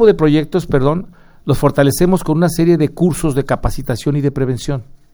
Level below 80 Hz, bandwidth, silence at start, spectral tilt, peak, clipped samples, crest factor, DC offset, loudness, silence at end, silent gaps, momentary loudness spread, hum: -30 dBFS; over 20 kHz; 0 s; -7 dB/octave; 0 dBFS; under 0.1%; 14 dB; under 0.1%; -15 LUFS; 0.2 s; none; 8 LU; none